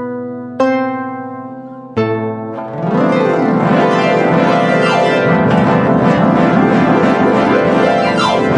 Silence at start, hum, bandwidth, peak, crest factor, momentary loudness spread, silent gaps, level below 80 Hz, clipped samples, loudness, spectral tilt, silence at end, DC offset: 0 s; none; 10.5 kHz; 0 dBFS; 12 dB; 12 LU; none; -50 dBFS; under 0.1%; -12 LUFS; -7 dB/octave; 0 s; under 0.1%